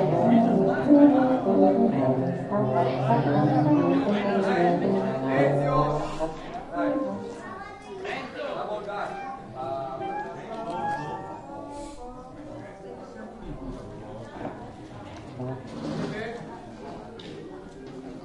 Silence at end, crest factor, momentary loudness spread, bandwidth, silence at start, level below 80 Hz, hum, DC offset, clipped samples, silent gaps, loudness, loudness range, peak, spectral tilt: 0 s; 20 dB; 20 LU; 10.5 kHz; 0 s; -50 dBFS; none; under 0.1%; under 0.1%; none; -25 LUFS; 17 LU; -6 dBFS; -8 dB/octave